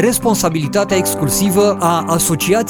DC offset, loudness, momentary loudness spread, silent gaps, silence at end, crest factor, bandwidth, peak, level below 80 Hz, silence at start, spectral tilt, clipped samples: under 0.1%; -14 LUFS; 3 LU; none; 0 s; 14 dB; 19 kHz; 0 dBFS; -40 dBFS; 0 s; -4.5 dB/octave; under 0.1%